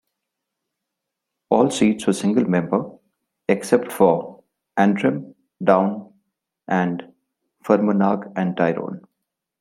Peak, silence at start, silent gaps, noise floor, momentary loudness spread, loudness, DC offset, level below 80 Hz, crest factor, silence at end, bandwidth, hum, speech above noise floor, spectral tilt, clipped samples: -2 dBFS; 1.5 s; none; -82 dBFS; 14 LU; -20 LUFS; under 0.1%; -64 dBFS; 20 dB; 0.6 s; 15.5 kHz; none; 63 dB; -6.5 dB/octave; under 0.1%